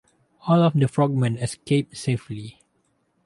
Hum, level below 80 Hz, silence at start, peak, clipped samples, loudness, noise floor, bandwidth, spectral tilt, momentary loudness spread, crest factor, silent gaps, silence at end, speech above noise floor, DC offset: none; -58 dBFS; 0.45 s; -6 dBFS; under 0.1%; -22 LUFS; -68 dBFS; 11.5 kHz; -7 dB/octave; 17 LU; 16 dB; none; 0.75 s; 47 dB; under 0.1%